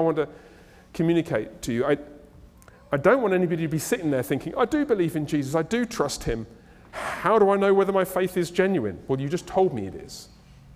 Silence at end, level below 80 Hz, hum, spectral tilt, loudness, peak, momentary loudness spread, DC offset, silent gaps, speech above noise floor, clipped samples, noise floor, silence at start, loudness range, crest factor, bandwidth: 0.5 s; -50 dBFS; none; -6 dB/octave; -24 LUFS; -6 dBFS; 13 LU; under 0.1%; none; 27 dB; under 0.1%; -50 dBFS; 0 s; 3 LU; 18 dB; 16 kHz